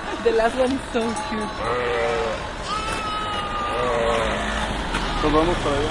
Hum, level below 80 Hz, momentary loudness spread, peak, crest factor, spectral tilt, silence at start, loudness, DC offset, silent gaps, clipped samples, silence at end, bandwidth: none; -34 dBFS; 6 LU; -6 dBFS; 18 dB; -4.5 dB/octave; 0 s; -23 LUFS; under 0.1%; none; under 0.1%; 0 s; 11.5 kHz